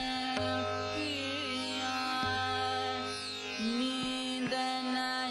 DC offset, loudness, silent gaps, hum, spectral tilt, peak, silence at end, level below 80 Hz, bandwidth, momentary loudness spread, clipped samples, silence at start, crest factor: under 0.1%; -33 LUFS; none; none; -3.5 dB/octave; -16 dBFS; 0 s; -58 dBFS; 16 kHz; 3 LU; under 0.1%; 0 s; 20 dB